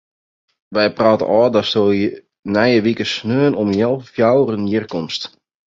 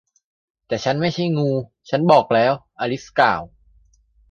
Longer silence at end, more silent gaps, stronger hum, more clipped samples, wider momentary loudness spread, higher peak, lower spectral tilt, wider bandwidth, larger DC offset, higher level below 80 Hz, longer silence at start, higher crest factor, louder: second, 0.4 s vs 0.85 s; first, 2.39-2.43 s vs none; neither; neither; about the same, 9 LU vs 11 LU; about the same, 0 dBFS vs 0 dBFS; about the same, -6.5 dB/octave vs -6.5 dB/octave; second, 7.8 kHz vs 8.6 kHz; neither; about the same, -52 dBFS vs -56 dBFS; about the same, 0.7 s vs 0.7 s; about the same, 16 dB vs 20 dB; first, -16 LUFS vs -19 LUFS